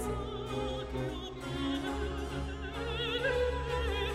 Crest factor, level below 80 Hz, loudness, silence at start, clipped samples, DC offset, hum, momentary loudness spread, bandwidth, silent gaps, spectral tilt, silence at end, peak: 14 dB; -42 dBFS; -35 LUFS; 0 s; under 0.1%; under 0.1%; none; 7 LU; 14 kHz; none; -5.5 dB/octave; 0 s; -20 dBFS